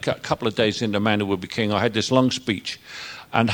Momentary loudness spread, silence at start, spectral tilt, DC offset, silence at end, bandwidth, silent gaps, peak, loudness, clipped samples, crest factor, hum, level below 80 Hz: 12 LU; 0 s; -5 dB/octave; under 0.1%; 0 s; 17 kHz; none; -2 dBFS; -22 LUFS; under 0.1%; 22 dB; none; -56 dBFS